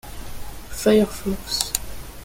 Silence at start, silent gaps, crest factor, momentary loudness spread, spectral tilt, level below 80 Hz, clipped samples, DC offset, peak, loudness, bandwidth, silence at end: 0.05 s; none; 22 dB; 20 LU; -4 dB/octave; -38 dBFS; under 0.1%; under 0.1%; 0 dBFS; -22 LUFS; 17 kHz; 0 s